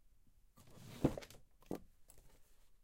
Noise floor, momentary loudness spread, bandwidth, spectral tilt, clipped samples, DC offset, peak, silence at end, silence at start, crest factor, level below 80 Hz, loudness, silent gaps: -67 dBFS; 26 LU; 16.5 kHz; -7 dB/octave; under 0.1%; under 0.1%; -20 dBFS; 0.05 s; 0 s; 28 dB; -60 dBFS; -44 LUFS; none